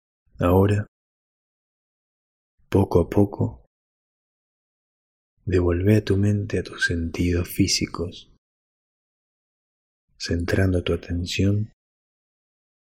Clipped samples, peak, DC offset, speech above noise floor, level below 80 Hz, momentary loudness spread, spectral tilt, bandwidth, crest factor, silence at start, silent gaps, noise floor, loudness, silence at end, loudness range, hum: under 0.1%; -4 dBFS; under 0.1%; over 69 dB; -44 dBFS; 10 LU; -6 dB/octave; 16 kHz; 20 dB; 0.4 s; 0.88-2.58 s, 3.67-5.37 s, 8.38-10.08 s; under -90 dBFS; -23 LUFS; 1.3 s; 5 LU; none